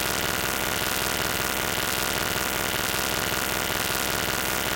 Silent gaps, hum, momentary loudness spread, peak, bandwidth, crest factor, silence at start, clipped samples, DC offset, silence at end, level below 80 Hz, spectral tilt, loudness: none; 60 Hz at -45 dBFS; 0 LU; -4 dBFS; 17.5 kHz; 22 dB; 0 s; under 0.1%; under 0.1%; 0 s; -44 dBFS; -2 dB/octave; -24 LUFS